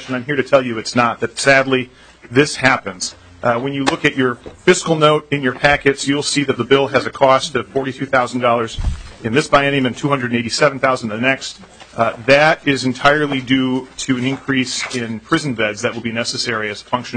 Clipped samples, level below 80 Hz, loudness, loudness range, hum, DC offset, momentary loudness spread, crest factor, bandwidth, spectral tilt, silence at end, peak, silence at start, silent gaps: under 0.1%; -38 dBFS; -16 LUFS; 2 LU; none; under 0.1%; 9 LU; 16 dB; 9.4 kHz; -4.5 dB/octave; 0 s; 0 dBFS; 0 s; none